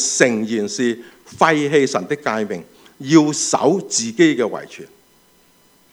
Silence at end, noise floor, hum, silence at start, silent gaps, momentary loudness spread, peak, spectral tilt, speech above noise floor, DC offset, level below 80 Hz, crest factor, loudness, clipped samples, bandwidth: 1.05 s; -54 dBFS; none; 0 s; none; 16 LU; 0 dBFS; -3.5 dB/octave; 37 dB; under 0.1%; -66 dBFS; 18 dB; -17 LUFS; under 0.1%; 12.5 kHz